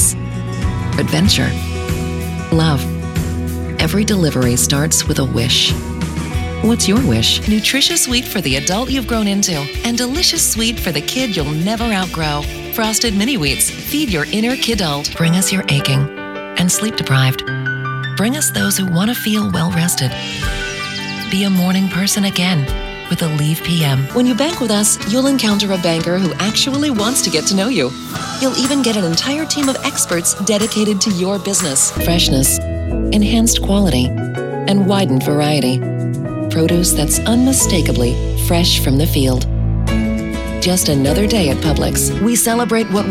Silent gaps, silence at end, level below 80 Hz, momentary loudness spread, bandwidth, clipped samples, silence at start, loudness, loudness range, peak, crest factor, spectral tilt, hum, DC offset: none; 0 s; -28 dBFS; 8 LU; 16.5 kHz; under 0.1%; 0 s; -15 LUFS; 3 LU; -2 dBFS; 14 dB; -4 dB/octave; none; under 0.1%